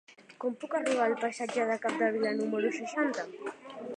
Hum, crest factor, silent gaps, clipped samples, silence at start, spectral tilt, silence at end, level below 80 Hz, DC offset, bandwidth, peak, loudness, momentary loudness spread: none; 18 dB; none; under 0.1%; 0.1 s; -4 dB/octave; 0 s; -86 dBFS; under 0.1%; 10.5 kHz; -14 dBFS; -31 LUFS; 10 LU